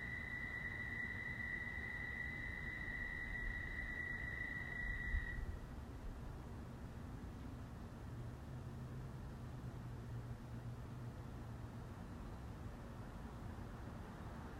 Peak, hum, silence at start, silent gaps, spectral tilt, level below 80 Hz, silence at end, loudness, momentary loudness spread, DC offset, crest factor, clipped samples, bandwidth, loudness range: -28 dBFS; none; 0 s; none; -6.5 dB/octave; -54 dBFS; 0 s; -48 LUFS; 8 LU; under 0.1%; 20 dB; under 0.1%; 16 kHz; 7 LU